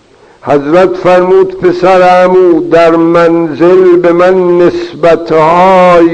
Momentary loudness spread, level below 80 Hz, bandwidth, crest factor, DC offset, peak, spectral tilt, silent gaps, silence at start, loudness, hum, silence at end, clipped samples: 5 LU; -40 dBFS; 8.6 kHz; 6 dB; 0.2%; 0 dBFS; -7 dB/octave; none; 0.45 s; -6 LUFS; none; 0 s; 6%